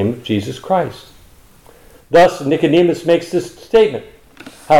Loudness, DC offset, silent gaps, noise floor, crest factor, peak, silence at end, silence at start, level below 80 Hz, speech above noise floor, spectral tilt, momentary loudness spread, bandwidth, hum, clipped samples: -15 LUFS; under 0.1%; none; -45 dBFS; 14 dB; -2 dBFS; 0 s; 0 s; -48 dBFS; 31 dB; -6 dB/octave; 10 LU; 16 kHz; none; under 0.1%